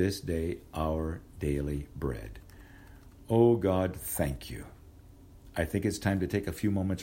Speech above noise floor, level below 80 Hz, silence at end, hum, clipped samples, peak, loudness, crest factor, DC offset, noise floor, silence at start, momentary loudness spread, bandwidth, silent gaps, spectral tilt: 23 dB; -44 dBFS; 0 s; none; under 0.1%; -10 dBFS; -31 LUFS; 20 dB; under 0.1%; -53 dBFS; 0 s; 16 LU; 16 kHz; none; -6.5 dB/octave